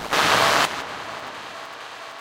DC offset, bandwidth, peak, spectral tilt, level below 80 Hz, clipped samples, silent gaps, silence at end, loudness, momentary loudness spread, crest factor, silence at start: under 0.1%; 17 kHz; -2 dBFS; -1.5 dB/octave; -56 dBFS; under 0.1%; none; 0 s; -20 LUFS; 19 LU; 22 dB; 0 s